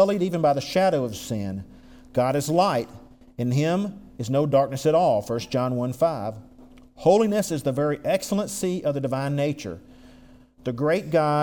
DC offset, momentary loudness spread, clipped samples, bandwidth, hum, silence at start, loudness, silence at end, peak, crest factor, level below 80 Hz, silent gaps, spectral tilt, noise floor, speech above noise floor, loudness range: under 0.1%; 13 LU; under 0.1%; 20 kHz; none; 0 s; -24 LUFS; 0 s; -6 dBFS; 18 dB; -54 dBFS; none; -6 dB/octave; -50 dBFS; 27 dB; 3 LU